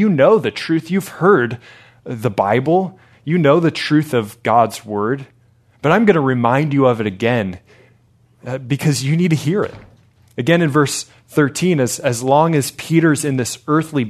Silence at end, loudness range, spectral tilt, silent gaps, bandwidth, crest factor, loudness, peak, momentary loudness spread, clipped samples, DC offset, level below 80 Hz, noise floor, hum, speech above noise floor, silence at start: 0 s; 2 LU; -6 dB/octave; none; 14 kHz; 16 dB; -16 LUFS; 0 dBFS; 10 LU; under 0.1%; under 0.1%; -58 dBFS; -54 dBFS; none; 38 dB; 0 s